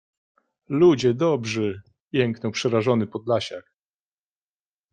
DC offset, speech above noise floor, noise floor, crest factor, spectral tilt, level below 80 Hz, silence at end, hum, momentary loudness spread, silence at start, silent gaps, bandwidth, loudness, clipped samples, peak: under 0.1%; over 68 dB; under -90 dBFS; 18 dB; -6 dB/octave; -64 dBFS; 1.35 s; 50 Hz at -55 dBFS; 11 LU; 0.7 s; 2.02-2.11 s; 9.2 kHz; -23 LUFS; under 0.1%; -6 dBFS